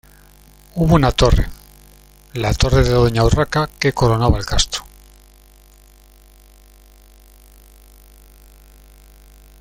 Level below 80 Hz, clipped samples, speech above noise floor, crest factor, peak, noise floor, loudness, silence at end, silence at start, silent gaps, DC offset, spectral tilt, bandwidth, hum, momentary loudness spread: -26 dBFS; under 0.1%; 32 dB; 18 dB; 0 dBFS; -47 dBFS; -16 LUFS; 4.8 s; 0.75 s; none; under 0.1%; -5.5 dB/octave; 16.5 kHz; 50 Hz at -35 dBFS; 10 LU